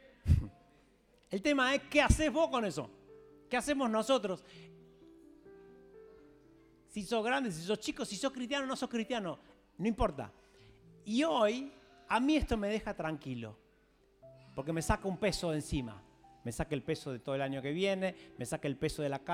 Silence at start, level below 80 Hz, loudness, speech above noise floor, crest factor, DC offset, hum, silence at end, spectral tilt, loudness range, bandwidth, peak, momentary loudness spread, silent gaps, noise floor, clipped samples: 0.25 s; -48 dBFS; -34 LUFS; 34 dB; 22 dB; under 0.1%; none; 0 s; -5 dB/octave; 6 LU; 16 kHz; -12 dBFS; 16 LU; none; -68 dBFS; under 0.1%